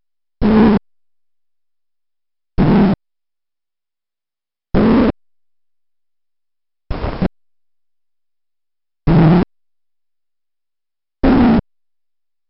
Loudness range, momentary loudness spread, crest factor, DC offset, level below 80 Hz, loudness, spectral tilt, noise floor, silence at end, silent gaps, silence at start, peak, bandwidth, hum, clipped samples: 12 LU; 14 LU; 16 dB; under 0.1%; -30 dBFS; -14 LUFS; -7.5 dB/octave; under -90 dBFS; 0.9 s; none; 0.4 s; -2 dBFS; 5.8 kHz; none; under 0.1%